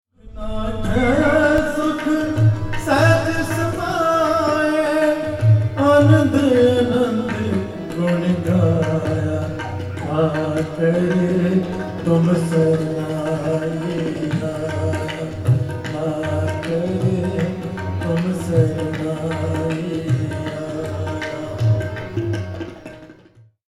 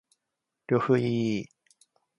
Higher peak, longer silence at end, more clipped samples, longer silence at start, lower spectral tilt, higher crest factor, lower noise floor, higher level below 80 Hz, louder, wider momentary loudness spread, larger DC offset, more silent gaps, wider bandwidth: first, -2 dBFS vs -10 dBFS; second, 0.55 s vs 0.75 s; neither; second, 0.25 s vs 0.7 s; about the same, -7 dB/octave vs -7.5 dB/octave; about the same, 16 dB vs 18 dB; second, -49 dBFS vs -85 dBFS; first, -38 dBFS vs -68 dBFS; first, -19 LUFS vs -27 LUFS; about the same, 11 LU vs 10 LU; neither; neither; first, 13.5 kHz vs 11 kHz